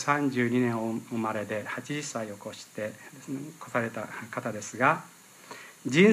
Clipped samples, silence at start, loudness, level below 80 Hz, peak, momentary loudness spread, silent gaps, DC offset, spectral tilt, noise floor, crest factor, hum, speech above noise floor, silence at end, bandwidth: under 0.1%; 0 s; -30 LUFS; -76 dBFS; -8 dBFS; 16 LU; none; under 0.1%; -5.5 dB/octave; -48 dBFS; 22 dB; none; 19 dB; 0 s; 15.5 kHz